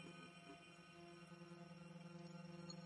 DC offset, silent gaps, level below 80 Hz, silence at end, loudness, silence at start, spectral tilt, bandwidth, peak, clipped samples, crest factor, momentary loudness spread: under 0.1%; none; -88 dBFS; 0 s; -59 LUFS; 0 s; -5 dB/octave; 11 kHz; -40 dBFS; under 0.1%; 18 dB; 4 LU